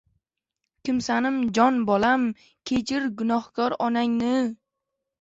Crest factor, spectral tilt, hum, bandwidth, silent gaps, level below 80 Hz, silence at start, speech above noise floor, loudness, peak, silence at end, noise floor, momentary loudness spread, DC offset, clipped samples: 18 dB; -5 dB/octave; none; 8 kHz; none; -60 dBFS; 0.85 s; 60 dB; -24 LUFS; -6 dBFS; 0.65 s; -83 dBFS; 8 LU; under 0.1%; under 0.1%